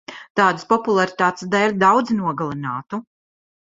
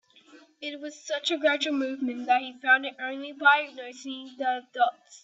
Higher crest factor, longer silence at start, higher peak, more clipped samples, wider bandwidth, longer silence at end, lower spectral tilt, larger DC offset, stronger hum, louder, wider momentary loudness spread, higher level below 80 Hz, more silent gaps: about the same, 18 dB vs 20 dB; second, 0.1 s vs 0.35 s; first, -2 dBFS vs -8 dBFS; neither; about the same, 7.8 kHz vs 8 kHz; first, 0.65 s vs 0.05 s; first, -5.5 dB/octave vs -1 dB/octave; neither; neither; first, -19 LUFS vs -26 LUFS; second, 12 LU vs 16 LU; first, -62 dBFS vs -82 dBFS; first, 0.30-0.35 s vs none